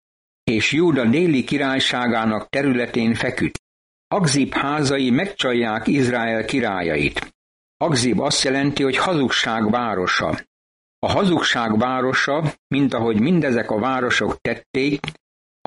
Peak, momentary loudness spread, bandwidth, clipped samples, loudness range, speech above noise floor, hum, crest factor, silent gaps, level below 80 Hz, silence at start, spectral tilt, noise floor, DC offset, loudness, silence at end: -6 dBFS; 7 LU; 11.5 kHz; under 0.1%; 2 LU; over 71 dB; none; 14 dB; 3.59-4.11 s, 7.35-7.80 s, 10.47-11.02 s, 12.58-12.70 s, 14.66-14.74 s; -50 dBFS; 0.45 s; -4.5 dB/octave; under -90 dBFS; under 0.1%; -20 LUFS; 0.55 s